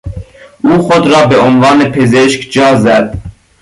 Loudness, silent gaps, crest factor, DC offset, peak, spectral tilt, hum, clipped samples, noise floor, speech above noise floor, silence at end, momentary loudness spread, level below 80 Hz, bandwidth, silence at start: -8 LUFS; none; 8 dB; under 0.1%; 0 dBFS; -5.5 dB/octave; none; under 0.1%; -28 dBFS; 21 dB; 0.3 s; 12 LU; -34 dBFS; 11.5 kHz; 0.05 s